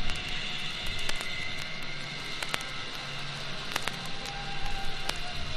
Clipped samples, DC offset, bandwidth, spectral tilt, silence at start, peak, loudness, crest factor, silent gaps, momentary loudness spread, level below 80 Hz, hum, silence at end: under 0.1%; under 0.1%; 14.5 kHz; -2.5 dB/octave; 0 s; -6 dBFS; -34 LUFS; 26 dB; none; 4 LU; -44 dBFS; none; 0 s